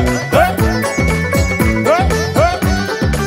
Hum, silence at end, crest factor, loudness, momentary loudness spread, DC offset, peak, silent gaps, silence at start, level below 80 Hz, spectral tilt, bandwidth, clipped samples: none; 0 s; 14 dB; -14 LUFS; 3 LU; under 0.1%; 0 dBFS; none; 0 s; -22 dBFS; -5.5 dB/octave; 16.5 kHz; under 0.1%